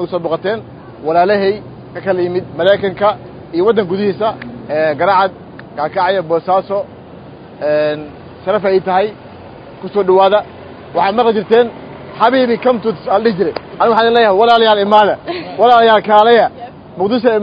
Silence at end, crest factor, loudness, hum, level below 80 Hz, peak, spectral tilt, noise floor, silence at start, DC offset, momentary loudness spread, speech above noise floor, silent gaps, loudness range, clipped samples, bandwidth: 0 s; 14 dB; -13 LUFS; none; -50 dBFS; 0 dBFS; -7.5 dB/octave; -34 dBFS; 0 s; under 0.1%; 16 LU; 22 dB; none; 6 LU; under 0.1%; 5.2 kHz